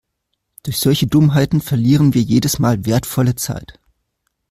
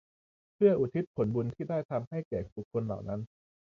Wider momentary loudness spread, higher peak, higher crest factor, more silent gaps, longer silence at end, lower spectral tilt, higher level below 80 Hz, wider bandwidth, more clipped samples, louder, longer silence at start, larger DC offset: about the same, 10 LU vs 11 LU; first, -2 dBFS vs -14 dBFS; second, 14 dB vs 20 dB; second, none vs 1.07-1.14 s, 1.85-1.89 s, 2.07-2.11 s, 2.25-2.31 s, 2.52-2.56 s, 2.65-2.71 s; first, 0.8 s vs 0.55 s; second, -6 dB/octave vs -10.5 dB/octave; first, -42 dBFS vs -60 dBFS; first, 16 kHz vs 6.4 kHz; neither; first, -15 LUFS vs -32 LUFS; about the same, 0.65 s vs 0.6 s; neither